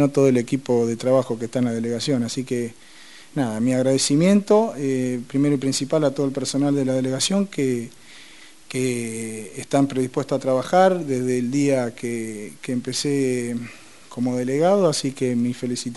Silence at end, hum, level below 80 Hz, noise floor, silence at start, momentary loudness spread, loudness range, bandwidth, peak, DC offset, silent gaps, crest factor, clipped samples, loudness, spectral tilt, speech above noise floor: 0 s; none; -62 dBFS; -47 dBFS; 0 s; 11 LU; 4 LU; 11.5 kHz; -2 dBFS; 0.4%; none; 18 dB; under 0.1%; -22 LUFS; -5.5 dB/octave; 26 dB